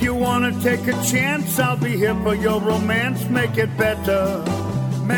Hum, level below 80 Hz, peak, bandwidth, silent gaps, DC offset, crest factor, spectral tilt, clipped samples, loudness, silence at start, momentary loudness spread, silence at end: none; -40 dBFS; -6 dBFS; 17.5 kHz; none; under 0.1%; 14 dB; -5.5 dB/octave; under 0.1%; -20 LUFS; 0 s; 3 LU; 0 s